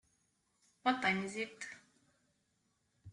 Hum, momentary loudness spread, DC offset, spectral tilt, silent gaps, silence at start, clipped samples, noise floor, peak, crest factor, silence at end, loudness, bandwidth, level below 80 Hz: none; 16 LU; under 0.1%; -4 dB/octave; none; 0.85 s; under 0.1%; -80 dBFS; -18 dBFS; 24 dB; 0 s; -36 LUFS; 11.5 kHz; -80 dBFS